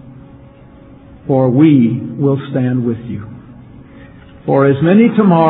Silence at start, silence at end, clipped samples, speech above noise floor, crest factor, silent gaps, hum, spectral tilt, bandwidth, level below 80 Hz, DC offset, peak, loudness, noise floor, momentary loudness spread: 0.05 s; 0 s; under 0.1%; 28 dB; 14 dB; none; none; -12.5 dB/octave; 4.1 kHz; -48 dBFS; under 0.1%; 0 dBFS; -12 LUFS; -39 dBFS; 18 LU